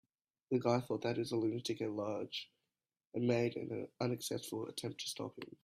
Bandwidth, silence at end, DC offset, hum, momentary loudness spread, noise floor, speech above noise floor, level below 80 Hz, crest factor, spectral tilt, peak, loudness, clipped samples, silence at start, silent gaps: 15.5 kHz; 0.2 s; under 0.1%; none; 10 LU; under -90 dBFS; over 52 dB; -78 dBFS; 20 dB; -5.5 dB/octave; -20 dBFS; -39 LUFS; under 0.1%; 0.5 s; none